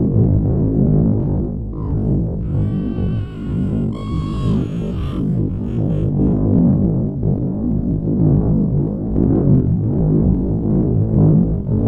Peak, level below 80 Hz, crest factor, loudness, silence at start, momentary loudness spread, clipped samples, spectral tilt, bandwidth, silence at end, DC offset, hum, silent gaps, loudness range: -2 dBFS; -26 dBFS; 14 dB; -17 LUFS; 0 s; 7 LU; under 0.1%; -11.5 dB/octave; 4.7 kHz; 0 s; under 0.1%; none; none; 5 LU